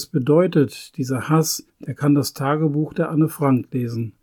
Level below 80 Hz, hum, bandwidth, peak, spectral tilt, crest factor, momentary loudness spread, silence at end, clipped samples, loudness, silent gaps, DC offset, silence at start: -62 dBFS; none; 19 kHz; -6 dBFS; -6.5 dB/octave; 14 dB; 9 LU; 0.15 s; under 0.1%; -20 LUFS; none; under 0.1%; 0 s